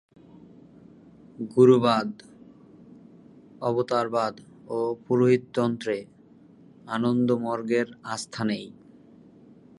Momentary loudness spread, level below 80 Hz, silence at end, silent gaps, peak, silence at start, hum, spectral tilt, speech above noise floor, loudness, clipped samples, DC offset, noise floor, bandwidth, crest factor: 14 LU; -68 dBFS; 1.1 s; none; -6 dBFS; 1.4 s; none; -6.5 dB/octave; 29 dB; -25 LUFS; under 0.1%; under 0.1%; -53 dBFS; 11.5 kHz; 22 dB